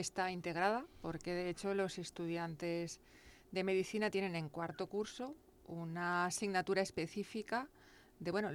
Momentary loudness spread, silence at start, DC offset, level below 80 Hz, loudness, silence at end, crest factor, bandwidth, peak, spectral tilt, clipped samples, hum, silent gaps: 11 LU; 0 s; under 0.1%; -70 dBFS; -40 LUFS; 0 s; 18 dB; 17 kHz; -22 dBFS; -4.5 dB/octave; under 0.1%; none; none